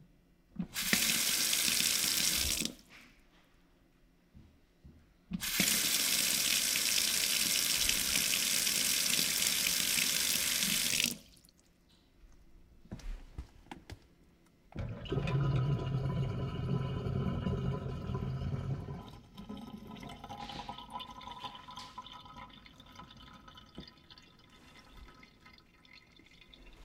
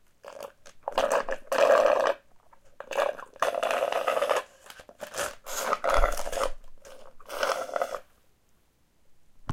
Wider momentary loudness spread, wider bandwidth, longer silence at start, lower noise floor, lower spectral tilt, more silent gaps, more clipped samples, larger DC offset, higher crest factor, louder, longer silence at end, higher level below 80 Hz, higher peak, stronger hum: about the same, 23 LU vs 21 LU; about the same, 17.5 kHz vs 17 kHz; second, 0 s vs 0.25 s; about the same, -66 dBFS vs -64 dBFS; about the same, -2 dB/octave vs -2.5 dB/octave; neither; neither; neither; about the same, 24 dB vs 22 dB; about the same, -30 LUFS vs -28 LUFS; about the same, 0 s vs 0 s; second, -54 dBFS vs -40 dBFS; second, -10 dBFS vs -6 dBFS; neither